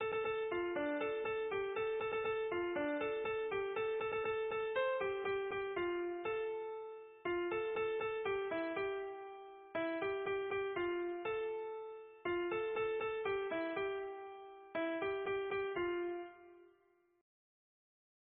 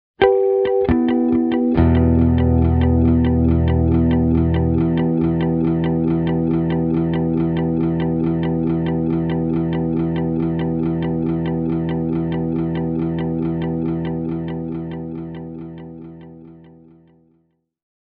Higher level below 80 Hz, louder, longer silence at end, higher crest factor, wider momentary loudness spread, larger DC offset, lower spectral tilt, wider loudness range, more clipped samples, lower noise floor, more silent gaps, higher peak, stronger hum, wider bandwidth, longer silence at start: second, -72 dBFS vs -30 dBFS; second, -39 LUFS vs -19 LUFS; about the same, 1.55 s vs 1.6 s; about the same, 14 dB vs 18 dB; about the same, 8 LU vs 10 LU; neither; second, -2.5 dB/octave vs -8.5 dB/octave; second, 3 LU vs 10 LU; neither; first, -73 dBFS vs -64 dBFS; neither; second, -26 dBFS vs 0 dBFS; neither; about the same, 4.2 kHz vs 4.3 kHz; second, 0 s vs 0.2 s